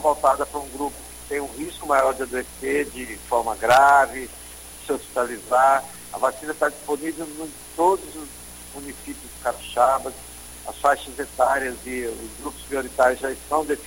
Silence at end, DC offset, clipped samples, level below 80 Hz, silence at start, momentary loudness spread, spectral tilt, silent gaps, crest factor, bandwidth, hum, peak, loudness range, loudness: 0 s; under 0.1%; under 0.1%; -48 dBFS; 0 s; 18 LU; -3 dB/octave; none; 20 dB; 17 kHz; none; -4 dBFS; 6 LU; -23 LUFS